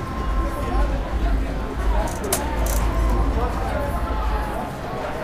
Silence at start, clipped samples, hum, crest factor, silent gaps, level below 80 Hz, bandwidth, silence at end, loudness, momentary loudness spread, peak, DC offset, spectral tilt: 0 s; under 0.1%; none; 18 dB; none; -24 dBFS; 16 kHz; 0 s; -24 LUFS; 5 LU; -4 dBFS; under 0.1%; -5.5 dB/octave